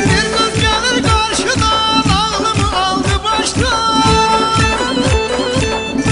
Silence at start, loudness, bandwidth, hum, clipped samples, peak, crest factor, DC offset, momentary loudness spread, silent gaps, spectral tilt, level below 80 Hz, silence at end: 0 s; -13 LUFS; 11 kHz; none; under 0.1%; 0 dBFS; 14 dB; under 0.1%; 4 LU; none; -4 dB/octave; -26 dBFS; 0 s